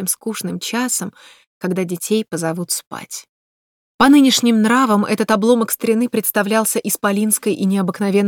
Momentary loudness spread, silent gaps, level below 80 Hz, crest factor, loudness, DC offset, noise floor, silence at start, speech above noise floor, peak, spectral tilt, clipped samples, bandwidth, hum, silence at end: 11 LU; 1.47-1.61 s, 2.87-2.91 s, 3.29-3.99 s; -58 dBFS; 16 dB; -17 LUFS; under 0.1%; under -90 dBFS; 0 s; over 73 dB; -2 dBFS; -4 dB/octave; under 0.1%; over 20 kHz; none; 0 s